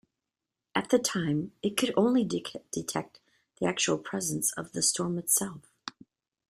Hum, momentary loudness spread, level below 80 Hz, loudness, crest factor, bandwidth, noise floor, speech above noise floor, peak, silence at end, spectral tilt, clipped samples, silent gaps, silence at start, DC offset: none; 12 LU; -68 dBFS; -29 LUFS; 22 dB; 15.5 kHz; -88 dBFS; 59 dB; -8 dBFS; 0.6 s; -3.5 dB/octave; under 0.1%; none; 0.75 s; under 0.1%